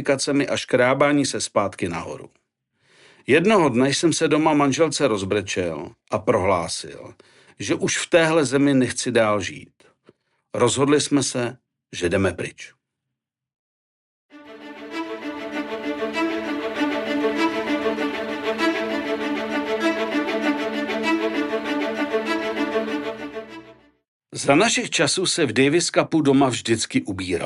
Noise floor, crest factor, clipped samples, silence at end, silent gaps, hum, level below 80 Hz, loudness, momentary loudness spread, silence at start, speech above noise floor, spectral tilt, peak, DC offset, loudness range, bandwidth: -83 dBFS; 18 dB; under 0.1%; 0 s; 13.59-14.29 s, 24.08-24.20 s; none; -60 dBFS; -21 LUFS; 14 LU; 0 s; 63 dB; -4 dB/octave; -4 dBFS; under 0.1%; 9 LU; 12 kHz